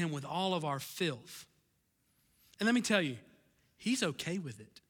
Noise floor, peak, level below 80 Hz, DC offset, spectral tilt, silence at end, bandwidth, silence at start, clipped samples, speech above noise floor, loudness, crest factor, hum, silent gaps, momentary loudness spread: -76 dBFS; -16 dBFS; -76 dBFS; under 0.1%; -4 dB/octave; 0.25 s; 18.5 kHz; 0 s; under 0.1%; 41 dB; -34 LUFS; 22 dB; none; none; 16 LU